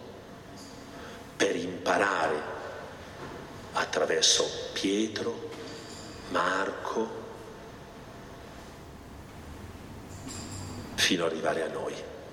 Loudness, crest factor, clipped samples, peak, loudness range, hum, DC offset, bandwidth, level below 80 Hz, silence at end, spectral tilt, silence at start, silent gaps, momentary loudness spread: -29 LUFS; 22 dB; under 0.1%; -10 dBFS; 14 LU; none; under 0.1%; 17 kHz; -56 dBFS; 0 s; -2.5 dB/octave; 0 s; none; 20 LU